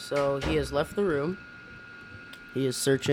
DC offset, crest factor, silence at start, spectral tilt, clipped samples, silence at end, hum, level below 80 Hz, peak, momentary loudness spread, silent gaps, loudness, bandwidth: under 0.1%; 16 dB; 0 s; -5 dB/octave; under 0.1%; 0 s; none; -46 dBFS; -12 dBFS; 18 LU; none; -28 LUFS; 17 kHz